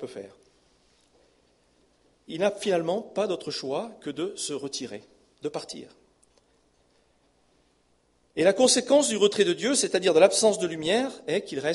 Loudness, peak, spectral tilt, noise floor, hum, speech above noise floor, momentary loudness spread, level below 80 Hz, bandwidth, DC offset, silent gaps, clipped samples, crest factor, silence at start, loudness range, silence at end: -25 LUFS; -4 dBFS; -3 dB/octave; -67 dBFS; 60 Hz at -65 dBFS; 42 dB; 18 LU; -70 dBFS; 11.5 kHz; under 0.1%; none; under 0.1%; 22 dB; 0 s; 17 LU; 0 s